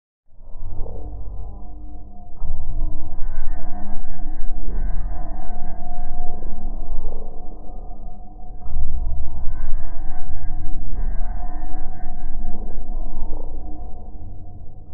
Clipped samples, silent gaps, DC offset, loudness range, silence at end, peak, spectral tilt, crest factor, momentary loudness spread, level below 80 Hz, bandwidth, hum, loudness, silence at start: under 0.1%; none; under 0.1%; 3 LU; 0 s; -2 dBFS; -12 dB/octave; 12 dB; 10 LU; -22 dBFS; 1.6 kHz; none; -34 LUFS; 0.25 s